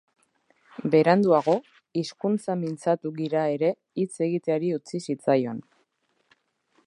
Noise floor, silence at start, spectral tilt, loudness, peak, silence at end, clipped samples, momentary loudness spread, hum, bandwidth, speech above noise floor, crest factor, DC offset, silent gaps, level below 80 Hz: -71 dBFS; 0.8 s; -7 dB/octave; -25 LUFS; -6 dBFS; 1.25 s; under 0.1%; 12 LU; none; 11 kHz; 47 dB; 20 dB; under 0.1%; none; -76 dBFS